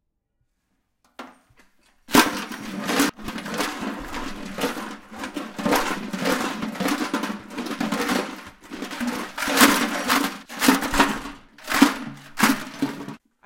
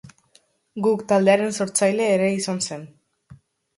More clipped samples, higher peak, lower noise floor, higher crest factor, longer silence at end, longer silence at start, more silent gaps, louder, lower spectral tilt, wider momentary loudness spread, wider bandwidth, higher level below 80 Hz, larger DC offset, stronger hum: neither; first, 0 dBFS vs -4 dBFS; first, -73 dBFS vs -60 dBFS; about the same, 24 dB vs 20 dB; about the same, 0.3 s vs 0.4 s; first, 1.2 s vs 0.05 s; neither; about the same, -23 LUFS vs -21 LUFS; second, -3 dB/octave vs -4.5 dB/octave; first, 17 LU vs 11 LU; first, 17 kHz vs 11.5 kHz; first, -46 dBFS vs -66 dBFS; neither; neither